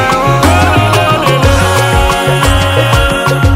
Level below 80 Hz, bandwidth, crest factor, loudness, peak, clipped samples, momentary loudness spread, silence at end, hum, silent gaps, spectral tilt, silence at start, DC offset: -18 dBFS; 16.5 kHz; 8 dB; -9 LUFS; 0 dBFS; 0.1%; 2 LU; 0 s; none; none; -5 dB/octave; 0 s; under 0.1%